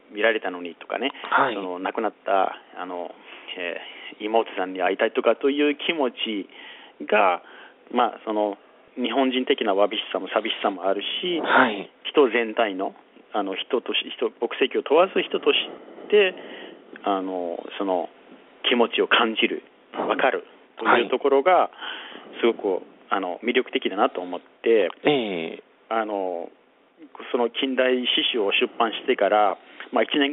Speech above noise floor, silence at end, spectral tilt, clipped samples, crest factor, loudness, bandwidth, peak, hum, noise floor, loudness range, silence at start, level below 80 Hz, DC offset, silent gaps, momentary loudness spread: 26 dB; 0 s; -0.5 dB/octave; under 0.1%; 22 dB; -23 LUFS; 4.1 kHz; -2 dBFS; none; -49 dBFS; 4 LU; 0.1 s; -76 dBFS; under 0.1%; none; 15 LU